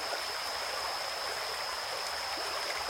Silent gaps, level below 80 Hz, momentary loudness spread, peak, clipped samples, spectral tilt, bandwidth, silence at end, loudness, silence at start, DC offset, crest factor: none; -66 dBFS; 1 LU; -18 dBFS; under 0.1%; 0 dB/octave; 16.5 kHz; 0 s; -34 LUFS; 0 s; under 0.1%; 18 dB